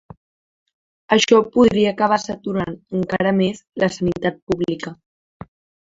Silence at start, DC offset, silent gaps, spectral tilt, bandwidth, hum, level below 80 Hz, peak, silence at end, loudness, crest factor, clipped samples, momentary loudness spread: 1.1 s; under 0.1%; 4.42-4.47 s; -5 dB/octave; 7.8 kHz; none; -52 dBFS; -2 dBFS; 0.9 s; -19 LUFS; 18 dB; under 0.1%; 11 LU